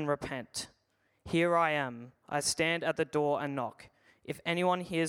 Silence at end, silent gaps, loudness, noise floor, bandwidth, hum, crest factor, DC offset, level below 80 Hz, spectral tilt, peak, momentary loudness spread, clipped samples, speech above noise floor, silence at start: 0 s; none; -32 LUFS; -75 dBFS; 16.5 kHz; none; 18 dB; under 0.1%; -66 dBFS; -4 dB/octave; -14 dBFS; 13 LU; under 0.1%; 43 dB; 0 s